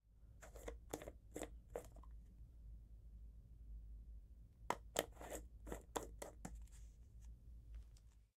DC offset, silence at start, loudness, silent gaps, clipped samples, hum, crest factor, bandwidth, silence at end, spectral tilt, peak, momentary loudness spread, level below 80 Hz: under 0.1%; 0.05 s; -54 LUFS; none; under 0.1%; none; 36 dB; 16 kHz; 0.1 s; -3.5 dB/octave; -18 dBFS; 14 LU; -58 dBFS